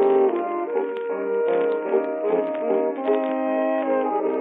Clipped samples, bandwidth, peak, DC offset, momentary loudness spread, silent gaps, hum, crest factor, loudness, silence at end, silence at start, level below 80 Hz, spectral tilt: under 0.1%; 3.9 kHz; -8 dBFS; under 0.1%; 4 LU; none; none; 14 dB; -23 LUFS; 0 s; 0 s; -88 dBFS; -4.5 dB/octave